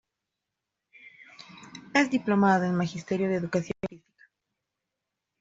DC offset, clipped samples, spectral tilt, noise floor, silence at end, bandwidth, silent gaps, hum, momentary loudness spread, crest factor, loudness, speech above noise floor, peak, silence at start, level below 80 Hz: under 0.1%; under 0.1%; -6.5 dB/octave; -86 dBFS; 1.45 s; 7.8 kHz; none; none; 24 LU; 22 dB; -26 LUFS; 60 dB; -8 dBFS; 1.5 s; -66 dBFS